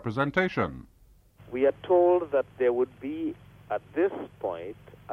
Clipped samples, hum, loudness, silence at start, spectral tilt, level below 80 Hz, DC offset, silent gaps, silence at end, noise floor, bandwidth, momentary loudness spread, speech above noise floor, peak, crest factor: under 0.1%; none; -28 LUFS; 0 s; -8 dB/octave; -58 dBFS; under 0.1%; none; 0 s; -56 dBFS; 6.4 kHz; 16 LU; 29 dB; -10 dBFS; 18 dB